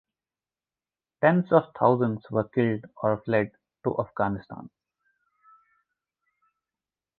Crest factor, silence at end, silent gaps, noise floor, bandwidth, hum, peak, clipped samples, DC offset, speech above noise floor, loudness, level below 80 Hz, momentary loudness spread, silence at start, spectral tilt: 24 dB; 2.55 s; none; under -90 dBFS; 4.4 kHz; none; -4 dBFS; under 0.1%; under 0.1%; over 65 dB; -26 LUFS; -62 dBFS; 11 LU; 1.2 s; -11 dB/octave